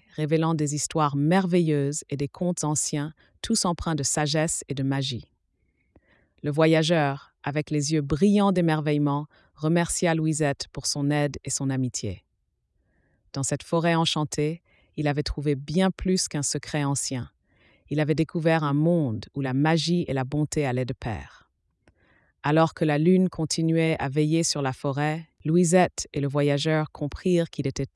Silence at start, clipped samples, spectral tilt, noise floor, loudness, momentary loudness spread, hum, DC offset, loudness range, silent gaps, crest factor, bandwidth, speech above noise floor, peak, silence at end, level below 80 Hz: 0.15 s; under 0.1%; -5 dB/octave; -74 dBFS; -25 LUFS; 10 LU; none; under 0.1%; 4 LU; none; 18 dB; 12 kHz; 50 dB; -6 dBFS; 0.1 s; -50 dBFS